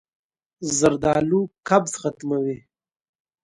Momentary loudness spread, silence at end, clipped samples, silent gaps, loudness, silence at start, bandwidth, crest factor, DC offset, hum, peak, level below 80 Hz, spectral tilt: 10 LU; 0.9 s; under 0.1%; none; -22 LUFS; 0.6 s; 11.5 kHz; 20 dB; under 0.1%; none; -4 dBFS; -54 dBFS; -5 dB/octave